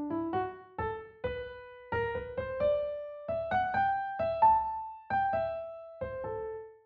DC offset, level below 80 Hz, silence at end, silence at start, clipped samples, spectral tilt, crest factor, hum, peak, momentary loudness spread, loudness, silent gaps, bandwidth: under 0.1%; -56 dBFS; 0.1 s; 0 s; under 0.1%; -4.5 dB/octave; 18 dB; none; -14 dBFS; 13 LU; -33 LUFS; none; 5.2 kHz